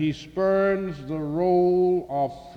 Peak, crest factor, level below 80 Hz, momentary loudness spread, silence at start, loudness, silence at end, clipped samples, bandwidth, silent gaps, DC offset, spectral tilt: -12 dBFS; 12 dB; -52 dBFS; 9 LU; 0 s; -24 LUFS; 0 s; under 0.1%; 6.6 kHz; none; under 0.1%; -8 dB/octave